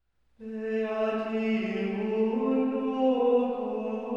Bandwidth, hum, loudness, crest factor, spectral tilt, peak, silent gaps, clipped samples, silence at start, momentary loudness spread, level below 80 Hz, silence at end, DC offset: 7 kHz; none; -28 LUFS; 14 dB; -8 dB/octave; -14 dBFS; none; under 0.1%; 0.4 s; 8 LU; -70 dBFS; 0 s; under 0.1%